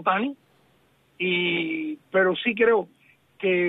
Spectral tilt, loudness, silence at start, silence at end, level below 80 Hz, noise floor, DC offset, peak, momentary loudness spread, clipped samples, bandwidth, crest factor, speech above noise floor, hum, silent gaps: -7.5 dB/octave; -24 LUFS; 0 s; 0 s; -70 dBFS; -62 dBFS; under 0.1%; -8 dBFS; 9 LU; under 0.1%; 4 kHz; 18 dB; 39 dB; none; none